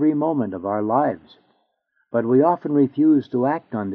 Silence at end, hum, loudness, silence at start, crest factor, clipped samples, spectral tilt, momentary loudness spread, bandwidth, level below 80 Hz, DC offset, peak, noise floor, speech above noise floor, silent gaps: 0 s; none; -20 LUFS; 0 s; 16 dB; under 0.1%; -8.5 dB/octave; 8 LU; 4.4 kHz; -70 dBFS; under 0.1%; -4 dBFS; -69 dBFS; 50 dB; none